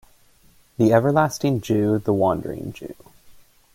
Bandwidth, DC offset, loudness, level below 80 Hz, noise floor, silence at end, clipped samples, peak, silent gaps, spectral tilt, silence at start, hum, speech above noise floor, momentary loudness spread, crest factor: 16.5 kHz; under 0.1%; -20 LUFS; -54 dBFS; -55 dBFS; 0.45 s; under 0.1%; -4 dBFS; none; -7 dB/octave; 0.8 s; none; 35 dB; 19 LU; 18 dB